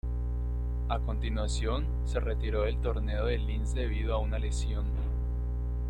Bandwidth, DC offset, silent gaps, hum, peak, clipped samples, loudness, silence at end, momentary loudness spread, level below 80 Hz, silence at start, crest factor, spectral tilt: 9.4 kHz; under 0.1%; none; 60 Hz at -30 dBFS; -14 dBFS; under 0.1%; -32 LUFS; 0 s; 3 LU; -30 dBFS; 0.05 s; 16 dB; -6.5 dB/octave